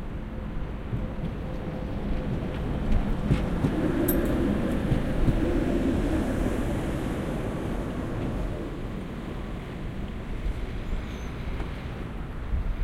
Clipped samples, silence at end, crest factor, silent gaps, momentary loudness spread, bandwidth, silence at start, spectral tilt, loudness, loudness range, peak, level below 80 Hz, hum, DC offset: under 0.1%; 0 s; 20 dB; none; 10 LU; 16 kHz; 0 s; -7.5 dB/octave; -30 LUFS; 9 LU; -8 dBFS; -32 dBFS; none; under 0.1%